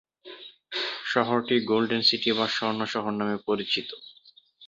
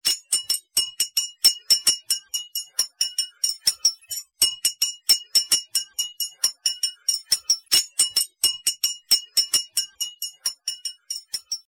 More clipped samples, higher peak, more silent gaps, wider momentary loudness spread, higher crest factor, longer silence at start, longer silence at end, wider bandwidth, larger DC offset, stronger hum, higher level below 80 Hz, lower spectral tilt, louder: neither; about the same, -6 dBFS vs -6 dBFS; neither; first, 22 LU vs 11 LU; about the same, 22 dB vs 20 dB; first, 0.25 s vs 0.05 s; second, 0 s vs 0.15 s; second, 7.8 kHz vs 17 kHz; neither; neither; about the same, -68 dBFS vs -70 dBFS; first, -4.5 dB/octave vs 3.5 dB/octave; second, -26 LUFS vs -21 LUFS